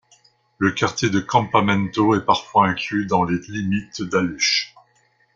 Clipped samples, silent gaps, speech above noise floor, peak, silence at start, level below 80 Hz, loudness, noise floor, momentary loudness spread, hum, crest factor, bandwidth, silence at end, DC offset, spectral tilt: under 0.1%; none; 42 dB; -2 dBFS; 0.6 s; -54 dBFS; -20 LUFS; -61 dBFS; 7 LU; none; 20 dB; 7.6 kHz; 0.7 s; under 0.1%; -4.5 dB/octave